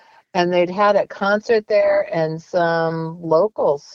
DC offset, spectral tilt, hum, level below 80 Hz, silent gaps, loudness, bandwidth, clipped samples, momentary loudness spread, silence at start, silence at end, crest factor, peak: under 0.1%; -6.5 dB/octave; none; -62 dBFS; none; -19 LUFS; 7.2 kHz; under 0.1%; 6 LU; 0.35 s; 0 s; 14 dB; -4 dBFS